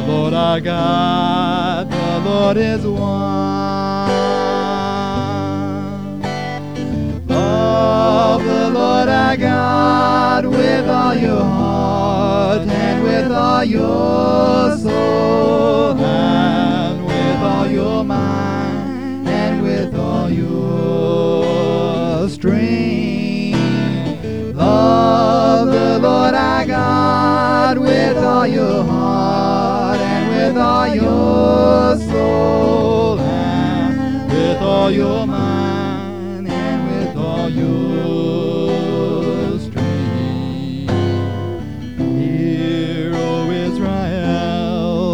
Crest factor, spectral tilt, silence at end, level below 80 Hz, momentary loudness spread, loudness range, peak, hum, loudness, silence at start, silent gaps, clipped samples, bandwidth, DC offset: 14 dB; -7 dB/octave; 0 s; -38 dBFS; 7 LU; 5 LU; -2 dBFS; none; -16 LUFS; 0 s; none; under 0.1%; 11 kHz; 1%